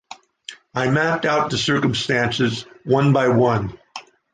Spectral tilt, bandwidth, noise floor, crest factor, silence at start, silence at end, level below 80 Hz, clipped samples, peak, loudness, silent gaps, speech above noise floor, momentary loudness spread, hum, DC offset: -5.5 dB/octave; 9.6 kHz; -42 dBFS; 16 dB; 0.1 s; 0.35 s; -50 dBFS; under 0.1%; -4 dBFS; -19 LUFS; none; 23 dB; 21 LU; none; under 0.1%